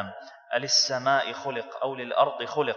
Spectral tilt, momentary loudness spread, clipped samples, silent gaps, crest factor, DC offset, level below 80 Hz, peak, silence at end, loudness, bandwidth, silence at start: -1.5 dB/octave; 12 LU; under 0.1%; none; 20 dB; under 0.1%; -84 dBFS; -8 dBFS; 0 s; -26 LUFS; 7.4 kHz; 0 s